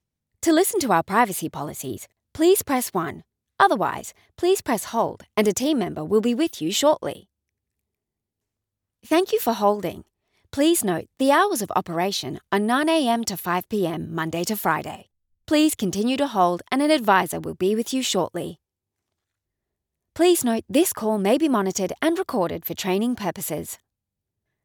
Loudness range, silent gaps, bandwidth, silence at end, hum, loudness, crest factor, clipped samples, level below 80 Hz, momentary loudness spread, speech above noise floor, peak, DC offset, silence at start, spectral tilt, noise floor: 4 LU; none; over 20 kHz; 0.9 s; none; -22 LUFS; 20 dB; under 0.1%; -62 dBFS; 12 LU; 62 dB; -2 dBFS; under 0.1%; 0.4 s; -4 dB/octave; -84 dBFS